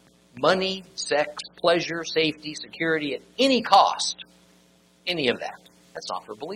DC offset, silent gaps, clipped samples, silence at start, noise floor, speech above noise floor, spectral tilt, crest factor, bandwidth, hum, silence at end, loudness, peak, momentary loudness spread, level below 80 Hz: under 0.1%; none; under 0.1%; 0.35 s; -59 dBFS; 34 dB; -3 dB/octave; 22 dB; 14 kHz; none; 0 s; -24 LUFS; -2 dBFS; 16 LU; -66 dBFS